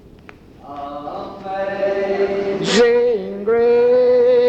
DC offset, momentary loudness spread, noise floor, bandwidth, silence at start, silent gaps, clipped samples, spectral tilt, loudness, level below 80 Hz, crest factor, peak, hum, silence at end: under 0.1%; 16 LU; -42 dBFS; 8.6 kHz; 0.65 s; none; under 0.1%; -4.5 dB/octave; -16 LUFS; -50 dBFS; 14 dB; -4 dBFS; none; 0 s